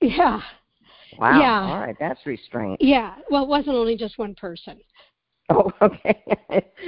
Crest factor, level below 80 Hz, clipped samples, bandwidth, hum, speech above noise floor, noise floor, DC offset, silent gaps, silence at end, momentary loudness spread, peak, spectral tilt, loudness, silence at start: 20 dB; -48 dBFS; under 0.1%; 5.4 kHz; none; 33 dB; -53 dBFS; under 0.1%; none; 0 s; 14 LU; 0 dBFS; -10.5 dB/octave; -21 LUFS; 0 s